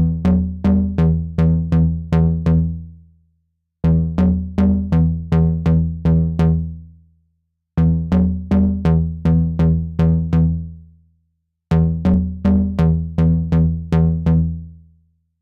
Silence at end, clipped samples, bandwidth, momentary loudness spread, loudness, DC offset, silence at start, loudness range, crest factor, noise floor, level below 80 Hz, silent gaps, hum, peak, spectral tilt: 0.65 s; under 0.1%; 4.4 kHz; 4 LU; -17 LUFS; under 0.1%; 0 s; 2 LU; 12 dB; -69 dBFS; -30 dBFS; none; none; -6 dBFS; -10.5 dB/octave